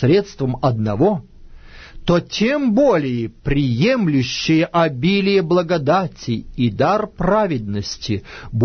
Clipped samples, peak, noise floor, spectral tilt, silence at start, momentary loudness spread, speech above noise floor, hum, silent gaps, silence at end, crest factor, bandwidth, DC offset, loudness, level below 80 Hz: under 0.1%; -4 dBFS; -39 dBFS; -6.5 dB/octave; 0 s; 9 LU; 21 dB; none; none; 0 s; 14 dB; 6.6 kHz; under 0.1%; -18 LUFS; -38 dBFS